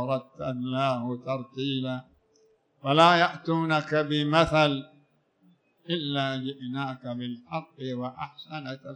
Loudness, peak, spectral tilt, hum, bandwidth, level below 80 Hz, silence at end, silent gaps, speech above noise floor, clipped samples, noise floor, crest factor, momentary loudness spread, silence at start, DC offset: -27 LUFS; -6 dBFS; -6 dB/octave; none; 9.6 kHz; -60 dBFS; 0 s; none; 38 dB; under 0.1%; -65 dBFS; 22 dB; 15 LU; 0 s; under 0.1%